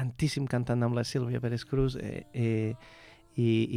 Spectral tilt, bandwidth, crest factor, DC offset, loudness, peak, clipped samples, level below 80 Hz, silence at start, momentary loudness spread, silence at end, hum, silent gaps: -7 dB/octave; 12.5 kHz; 14 dB; under 0.1%; -31 LUFS; -16 dBFS; under 0.1%; -50 dBFS; 0 s; 9 LU; 0 s; none; none